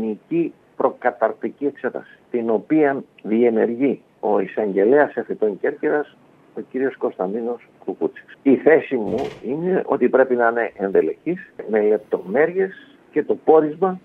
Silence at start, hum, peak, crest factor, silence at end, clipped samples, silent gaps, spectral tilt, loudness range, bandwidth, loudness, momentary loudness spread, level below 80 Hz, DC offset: 0 s; none; 0 dBFS; 20 dB; 0.05 s; under 0.1%; none; -9 dB/octave; 3 LU; 4.3 kHz; -20 LUFS; 12 LU; -66 dBFS; under 0.1%